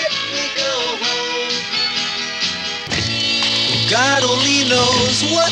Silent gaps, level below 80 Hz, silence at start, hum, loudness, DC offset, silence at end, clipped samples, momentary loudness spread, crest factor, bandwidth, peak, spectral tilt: none; -48 dBFS; 0 s; none; -16 LUFS; under 0.1%; 0 s; under 0.1%; 6 LU; 14 dB; 12 kHz; -4 dBFS; -2 dB/octave